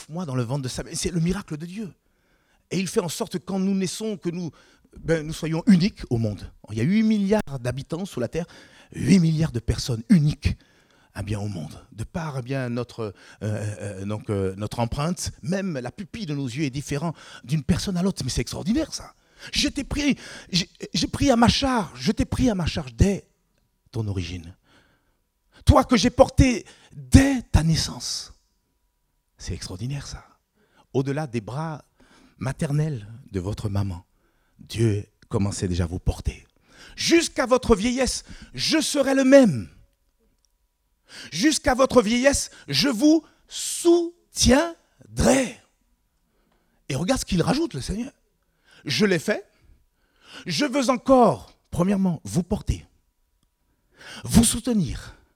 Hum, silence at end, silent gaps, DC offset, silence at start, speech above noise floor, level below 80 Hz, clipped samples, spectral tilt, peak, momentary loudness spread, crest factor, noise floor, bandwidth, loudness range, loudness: none; 0.2 s; none; under 0.1%; 0 s; 48 dB; -38 dBFS; under 0.1%; -5 dB/octave; 0 dBFS; 16 LU; 24 dB; -71 dBFS; 16.5 kHz; 9 LU; -23 LUFS